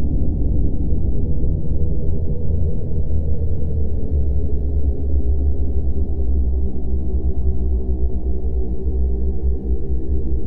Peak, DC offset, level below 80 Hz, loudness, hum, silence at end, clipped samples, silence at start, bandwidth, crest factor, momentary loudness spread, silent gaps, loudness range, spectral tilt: -4 dBFS; under 0.1%; -20 dBFS; -23 LUFS; none; 0 s; under 0.1%; 0 s; 1 kHz; 10 dB; 3 LU; none; 1 LU; -13.5 dB/octave